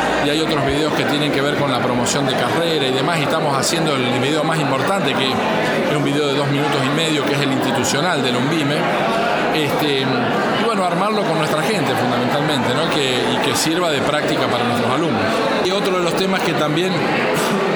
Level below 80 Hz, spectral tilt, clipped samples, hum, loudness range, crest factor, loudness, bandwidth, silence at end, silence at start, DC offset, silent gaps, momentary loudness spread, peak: -50 dBFS; -4.5 dB/octave; under 0.1%; none; 0 LU; 14 dB; -17 LUFS; over 20 kHz; 0 s; 0 s; under 0.1%; none; 1 LU; -4 dBFS